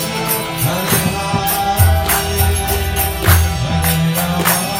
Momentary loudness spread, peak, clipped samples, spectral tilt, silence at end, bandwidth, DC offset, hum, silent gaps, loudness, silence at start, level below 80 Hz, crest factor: 4 LU; 0 dBFS; under 0.1%; -4 dB/octave; 0 s; 17 kHz; under 0.1%; none; none; -15 LUFS; 0 s; -24 dBFS; 16 dB